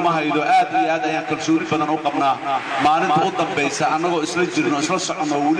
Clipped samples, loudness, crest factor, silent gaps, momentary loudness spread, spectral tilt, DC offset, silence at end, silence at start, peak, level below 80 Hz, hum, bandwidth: under 0.1%; -19 LUFS; 12 dB; none; 4 LU; -4 dB/octave; under 0.1%; 0 s; 0 s; -8 dBFS; -62 dBFS; none; 10.5 kHz